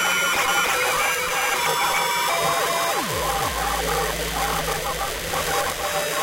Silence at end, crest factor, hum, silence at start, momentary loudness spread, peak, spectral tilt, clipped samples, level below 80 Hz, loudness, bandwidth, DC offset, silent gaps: 0 s; 16 dB; none; 0 s; 5 LU; -6 dBFS; -1.5 dB/octave; under 0.1%; -40 dBFS; -21 LUFS; 16 kHz; under 0.1%; none